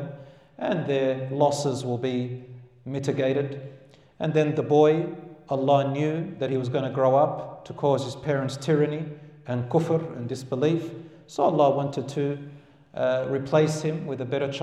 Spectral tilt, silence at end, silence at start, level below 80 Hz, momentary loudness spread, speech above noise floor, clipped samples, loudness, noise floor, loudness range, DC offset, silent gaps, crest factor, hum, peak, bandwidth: -7 dB/octave; 0 s; 0 s; -68 dBFS; 16 LU; 20 dB; under 0.1%; -25 LUFS; -45 dBFS; 3 LU; under 0.1%; none; 18 dB; none; -8 dBFS; 12.5 kHz